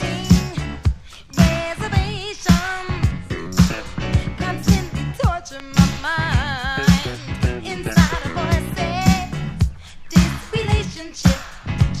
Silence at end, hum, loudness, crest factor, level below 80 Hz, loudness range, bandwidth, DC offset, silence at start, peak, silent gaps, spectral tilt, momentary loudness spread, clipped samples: 0 s; none; -20 LUFS; 20 dB; -28 dBFS; 1 LU; 14.5 kHz; under 0.1%; 0 s; 0 dBFS; none; -5.5 dB/octave; 9 LU; under 0.1%